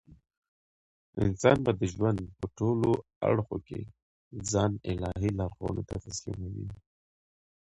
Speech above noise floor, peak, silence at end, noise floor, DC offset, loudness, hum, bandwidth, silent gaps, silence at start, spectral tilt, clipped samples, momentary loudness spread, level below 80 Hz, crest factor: over 60 dB; -8 dBFS; 1 s; under -90 dBFS; under 0.1%; -31 LUFS; none; 10.5 kHz; 3.16-3.21 s, 4.02-4.31 s; 1.15 s; -6.5 dB/octave; under 0.1%; 15 LU; -48 dBFS; 24 dB